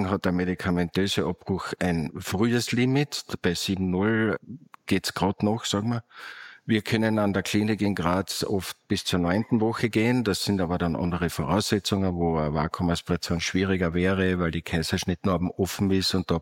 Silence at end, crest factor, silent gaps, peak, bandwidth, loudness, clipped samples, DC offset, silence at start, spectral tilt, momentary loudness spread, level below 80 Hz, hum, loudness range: 0 s; 18 dB; none; -8 dBFS; 17 kHz; -26 LUFS; under 0.1%; under 0.1%; 0 s; -5.5 dB/octave; 5 LU; -48 dBFS; none; 2 LU